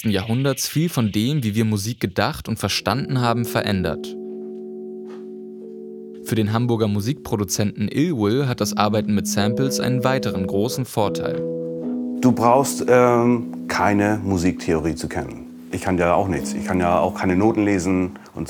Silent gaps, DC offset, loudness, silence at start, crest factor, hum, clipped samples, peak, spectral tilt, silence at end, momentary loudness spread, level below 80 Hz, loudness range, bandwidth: none; under 0.1%; -21 LUFS; 0 s; 18 dB; none; under 0.1%; -2 dBFS; -5.5 dB/octave; 0 s; 15 LU; -52 dBFS; 6 LU; 19 kHz